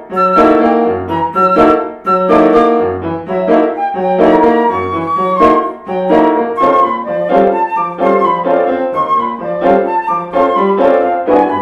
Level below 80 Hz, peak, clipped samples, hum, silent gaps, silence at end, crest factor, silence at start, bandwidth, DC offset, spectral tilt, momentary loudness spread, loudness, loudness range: -44 dBFS; 0 dBFS; under 0.1%; none; none; 0 s; 12 dB; 0 s; 8.4 kHz; under 0.1%; -8 dB/octave; 7 LU; -11 LUFS; 2 LU